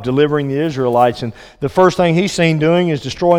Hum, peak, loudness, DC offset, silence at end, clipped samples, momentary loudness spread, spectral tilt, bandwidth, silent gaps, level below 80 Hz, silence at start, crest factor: none; 0 dBFS; -15 LUFS; under 0.1%; 0 s; under 0.1%; 8 LU; -6 dB/octave; 15.5 kHz; none; -46 dBFS; 0 s; 14 dB